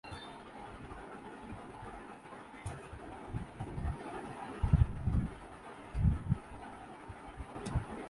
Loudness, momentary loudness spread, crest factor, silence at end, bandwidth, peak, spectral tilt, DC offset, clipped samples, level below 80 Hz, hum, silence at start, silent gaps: -40 LUFS; 17 LU; 24 dB; 0 s; 11.5 kHz; -14 dBFS; -7.5 dB/octave; under 0.1%; under 0.1%; -42 dBFS; none; 0.05 s; none